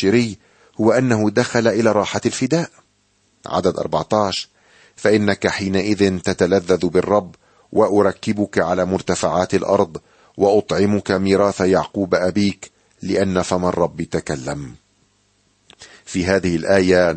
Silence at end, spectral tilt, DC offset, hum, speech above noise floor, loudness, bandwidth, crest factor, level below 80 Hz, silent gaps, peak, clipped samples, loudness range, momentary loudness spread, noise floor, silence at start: 0 s; -5.5 dB/octave; under 0.1%; 50 Hz at -50 dBFS; 44 dB; -18 LUFS; 8.8 kHz; 16 dB; -50 dBFS; none; -2 dBFS; under 0.1%; 4 LU; 10 LU; -61 dBFS; 0 s